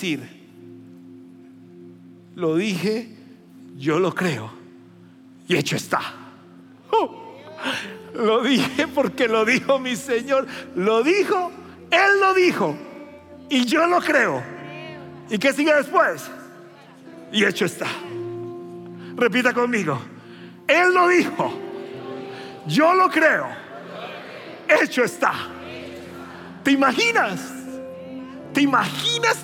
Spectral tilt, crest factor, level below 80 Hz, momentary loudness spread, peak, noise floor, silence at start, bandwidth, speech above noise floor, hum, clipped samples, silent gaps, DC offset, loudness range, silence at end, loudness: -4.5 dB/octave; 18 dB; -74 dBFS; 19 LU; -4 dBFS; -47 dBFS; 0 s; 17 kHz; 27 dB; none; under 0.1%; none; under 0.1%; 6 LU; 0 s; -20 LUFS